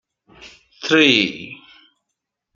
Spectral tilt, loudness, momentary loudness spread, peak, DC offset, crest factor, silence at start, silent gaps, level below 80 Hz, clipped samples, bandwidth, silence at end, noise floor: -3.5 dB/octave; -15 LUFS; 21 LU; 0 dBFS; under 0.1%; 22 dB; 0.45 s; none; -64 dBFS; under 0.1%; 7.4 kHz; 1 s; -80 dBFS